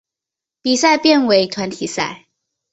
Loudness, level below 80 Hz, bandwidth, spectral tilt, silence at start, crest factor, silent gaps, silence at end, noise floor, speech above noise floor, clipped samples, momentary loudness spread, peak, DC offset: -16 LUFS; -60 dBFS; 8.2 kHz; -3 dB/octave; 0.65 s; 16 dB; none; 0.55 s; -86 dBFS; 71 dB; under 0.1%; 11 LU; -2 dBFS; under 0.1%